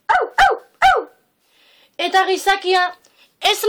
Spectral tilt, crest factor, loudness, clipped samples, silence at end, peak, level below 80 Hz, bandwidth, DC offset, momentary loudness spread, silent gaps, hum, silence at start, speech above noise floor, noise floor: -1 dB/octave; 12 dB; -17 LUFS; under 0.1%; 0 s; -6 dBFS; -46 dBFS; 19 kHz; under 0.1%; 7 LU; none; none; 0.1 s; 42 dB; -59 dBFS